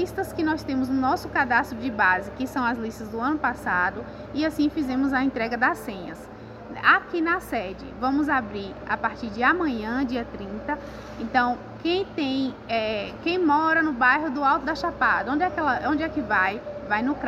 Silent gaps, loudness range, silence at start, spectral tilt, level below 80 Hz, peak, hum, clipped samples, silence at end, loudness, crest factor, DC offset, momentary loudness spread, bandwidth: none; 4 LU; 0 s; -5.5 dB/octave; -48 dBFS; -4 dBFS; none; under 0.1%; 0 s; -24 LUFS; 20 dB; under 0.1%; 12 LU; 15 kHz